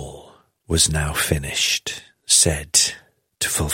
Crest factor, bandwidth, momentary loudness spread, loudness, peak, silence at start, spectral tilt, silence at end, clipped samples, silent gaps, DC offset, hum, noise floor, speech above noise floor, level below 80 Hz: 20 dB; 16.5 kHz; 12 LU; -18 LUFS; -2 dBFS; 0 s; -2 dB/octave; 0 s; under 0.1%; none; under 0.1%; none; -49 dBFS; 29 dB; -36 dBFS